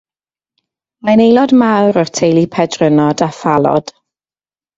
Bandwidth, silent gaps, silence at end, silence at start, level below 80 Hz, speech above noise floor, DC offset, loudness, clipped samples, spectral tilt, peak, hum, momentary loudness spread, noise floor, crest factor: 7.8 kHz; none; 0.95 s; 1.05 s; -52 dBFS; over 79 dB; under 0.1%; -12 LUFS; under 0.1%; -6 dB/octave; 0 dBFS; none; 7 LU; under -90 dBFS; 12 dB